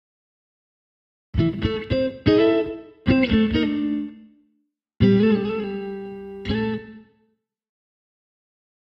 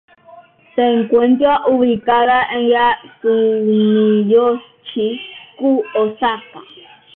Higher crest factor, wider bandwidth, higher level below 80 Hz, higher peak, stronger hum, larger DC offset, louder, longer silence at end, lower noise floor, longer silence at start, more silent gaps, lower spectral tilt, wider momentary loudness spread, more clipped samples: first, 20 dB vs 12 dB; first, 6 kHz vs 4.1 kHz; first, -40 dBFS vs -56 dBFS; about the same, -4 dBFS vs -2 dBFS; neither; neither; second, -22 LUFS vs -15 LUFS; first, 1.8 s vs 0.55 s; first, -70 dBFS vs -43 dBFS; first, 1.35 s vs 0.35 s; neither; about the same, -9 dB/octave vs -10 dB/octave; first, 15 LU vs 9 LU; neither